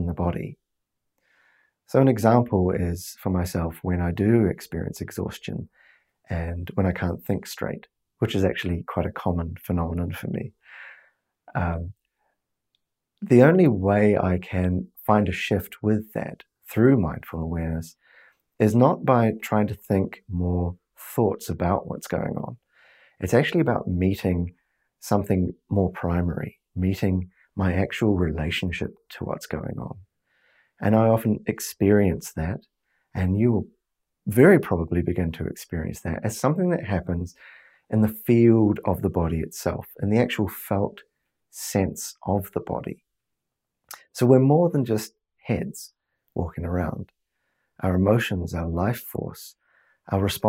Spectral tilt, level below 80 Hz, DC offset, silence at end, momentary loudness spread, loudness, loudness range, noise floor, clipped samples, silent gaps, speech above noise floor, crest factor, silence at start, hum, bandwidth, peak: -7 dB/octave; -48 dBFS; under 0.1%; 0 s; 16 LU; -24 LUFS; 6 LU; -82 dBFS; under 0.1%; none; 59 dB; 22 dB; 0 s; none; 16 kHz; -2 dBFS